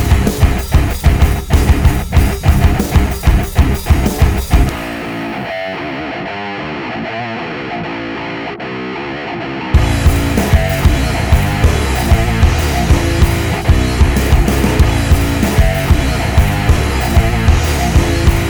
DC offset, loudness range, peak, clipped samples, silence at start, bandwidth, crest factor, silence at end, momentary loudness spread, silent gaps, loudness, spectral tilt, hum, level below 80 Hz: under 0.1%; 8 LU; 0 dBFS; under 0.1%; 0 s; over 20 kHz; 12 dB; 0 s; 9 LU; none; -14 LUFS; -6 dB/octave; none; -16 dBFS